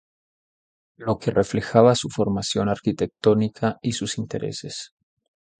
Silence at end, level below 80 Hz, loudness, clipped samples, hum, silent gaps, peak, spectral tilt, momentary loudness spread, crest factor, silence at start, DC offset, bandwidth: 0.75 s; -52 dBFS; -23 LUFS; under 0.1%; none; none; 0 dBFS; -5.5 dB/octave; 15 LU; 22 dB; 1 s; under 0.1%; 9.4 kHz